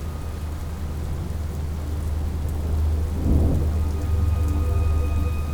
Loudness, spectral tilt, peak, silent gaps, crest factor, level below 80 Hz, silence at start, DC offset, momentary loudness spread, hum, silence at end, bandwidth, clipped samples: -25 LUFS; -7.5 dB/octave; -6 dBFS; none; 16 dB; -24 dBFS; 0 s; under 0.1%; 9 LU; none; 0 s; 16.5 kHz; under 0.1%